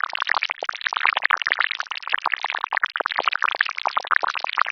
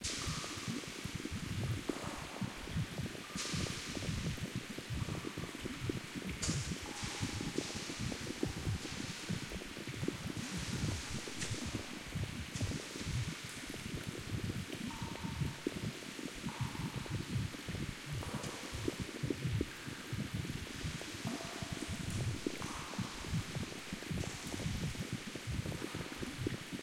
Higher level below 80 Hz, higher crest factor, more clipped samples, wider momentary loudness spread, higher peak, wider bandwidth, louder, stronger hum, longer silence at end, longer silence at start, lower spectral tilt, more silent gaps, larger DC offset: second, -82 dBFS vs -54 dBFS; about the same, 22 dB vs 20 dB; neither; about the same, 5 LU vs 4 LU; first, 0 dBFS vs -20 dBFS; second, 7.2 kHz vs 16.5 kHz; first, -22 LUFS vs -41 LUFS; neither; about the same, 0 s vs 0 s; about the same, 0.05 s vs 0 s; second, 1 dB/octave vs -4.5 dB/octave; neither; neither